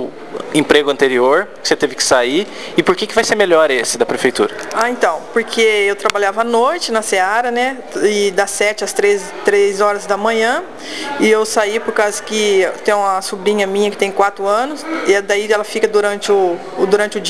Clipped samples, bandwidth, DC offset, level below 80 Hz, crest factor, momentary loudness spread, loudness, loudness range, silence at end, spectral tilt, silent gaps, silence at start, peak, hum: 0.1%; 12 kHz; 1%; -54 dBFS; 14 dB; 6 LU; -15 LUFS; 2 LU; 0 s; -2.5 dB/octave; none; 0 s; 0 dBFS; none